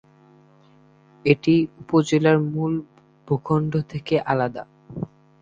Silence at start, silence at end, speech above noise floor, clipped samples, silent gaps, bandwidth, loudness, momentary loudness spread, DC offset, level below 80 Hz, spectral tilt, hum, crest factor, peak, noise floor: 1.25 s; 0.35 s; 33 dB; under 0.1%; none; 7.6 kHz; -22 LUFS; 16 LU; under 0.1%; -58 dBFS; -7.5 dB/octave; none; 20 dB; -2 dBFS; -54 dBFS